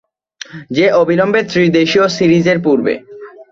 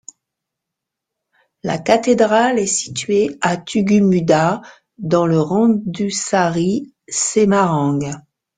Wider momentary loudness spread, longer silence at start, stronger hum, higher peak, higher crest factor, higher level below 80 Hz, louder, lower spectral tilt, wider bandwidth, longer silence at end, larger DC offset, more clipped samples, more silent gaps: first, 14 LU vs 10 LU; second, 0.55 s vs 1.65 s; neither; about the same, 0 dBFS vs 0 dBFS; about the same, 12 dB vs 16 dB; about the same, -52 dBFS vs -56 dBFS; first, -12 LUFS vs -16 LUFS; about the same, -6 dB/octave vs -5 dB/octave; second, 7.6 kHz vs 9.6 kHz; second, 0.1 s vs 0.35 s; neither; neither; neither